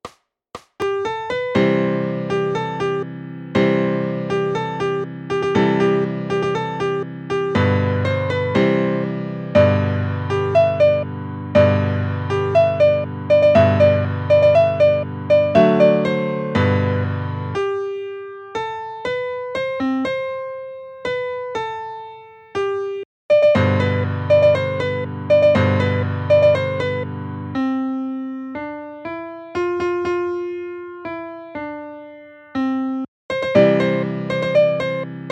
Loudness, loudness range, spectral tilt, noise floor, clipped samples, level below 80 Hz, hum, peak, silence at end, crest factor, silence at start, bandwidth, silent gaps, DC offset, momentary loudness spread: -19 LUFS; 10 LU; -8 dB/octave; -41 dBFS; under 0.1%; -54 dBFS; none; 0 dBFS; 0 s; 18 dB; 0.05 s; 8.6 kHz; 23.05-23.29 s, 33.08-33.29 s; under 0.1%; 15 LU